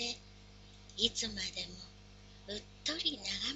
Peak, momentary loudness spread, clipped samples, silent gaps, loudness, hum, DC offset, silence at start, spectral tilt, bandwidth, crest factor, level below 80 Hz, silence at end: -14 dBFS; 24 LU; under 0.1%; none; -37 LUFS; 50 Hz at -55 dBFS; under 0.1%; 0 s; -1.5 dB/octave; 8.2 kHz; 28 dB; -58 dBFS; 0 s